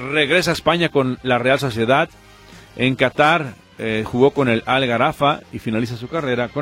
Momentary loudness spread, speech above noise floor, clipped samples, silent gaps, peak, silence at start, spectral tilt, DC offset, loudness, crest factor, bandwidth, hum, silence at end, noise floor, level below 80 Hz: 9 LU; 25 dB; under 0.1%; none; -2 dBFS; 0 s; -5.5 dB/octave; under 0.1%; -18 LUFS; 18 dB; 16.5 kHz; none; 0 s; -43 dBFS; -48 dBFS